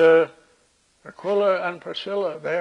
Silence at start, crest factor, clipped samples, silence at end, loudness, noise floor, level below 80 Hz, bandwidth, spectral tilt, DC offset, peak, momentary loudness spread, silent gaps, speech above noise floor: 0 s; 18 dB; under 0.1%; 0 s; -23 LUFS; -62 dBFS; -72 dBFS; 7.6 kHz; -5.5 dB/octave; under 0.1%; -6 dBFS; 11 LU; none; 42 dB